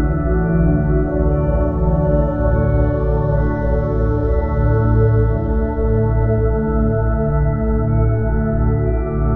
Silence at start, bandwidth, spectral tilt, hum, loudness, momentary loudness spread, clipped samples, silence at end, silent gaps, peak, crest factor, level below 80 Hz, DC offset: 0 s; 2.5 kHz; -12.5 dB/octave; none; -17 LUFS; 3 LU; under 0.1%; 0 s; none; -2 dBFS; 12 dB; -20 dBFS; under 0.1%